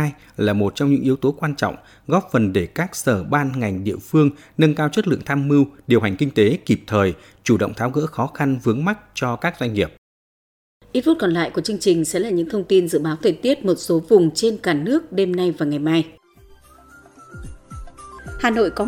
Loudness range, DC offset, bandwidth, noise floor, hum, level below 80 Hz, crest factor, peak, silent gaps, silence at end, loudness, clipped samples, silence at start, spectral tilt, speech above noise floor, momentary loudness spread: 5 LU; under 0.1%; 17.5 kHz; -49 dBFS; none; -48 dBFS; 18 dB; -2 dBFS; 9.98-10.80 s; 0 s; -20 LUFS; under 0.1%; 0 s; -6 dB/octave; 30 dB; 8 LU